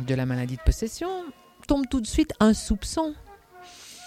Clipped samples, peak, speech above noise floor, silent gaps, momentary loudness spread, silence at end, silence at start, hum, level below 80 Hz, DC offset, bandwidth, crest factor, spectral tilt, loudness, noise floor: under 0.1%; -6 dBFS; 24 dB; none; 23 LU; 0 s; 0 s; none; -34 dBFS; under 0.1%; 16 kHz; 20 dB; -5.5 dB/octave; -26 LUFS; -48 dBFS